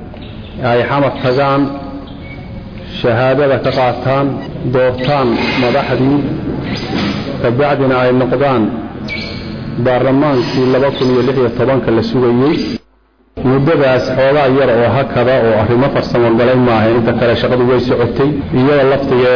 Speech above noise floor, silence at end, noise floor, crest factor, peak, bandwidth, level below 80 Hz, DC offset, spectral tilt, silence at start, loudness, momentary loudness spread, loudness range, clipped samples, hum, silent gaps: 40 dB; 0 s; -51 dBFS; 8 dB; -4 dBFS; 5.4 kHz; -36 dBFS; under 0.1%; -8 dB/octave; 0 s; -12 LUFS; 11 LU; 4 LU; under 0.1%; none; none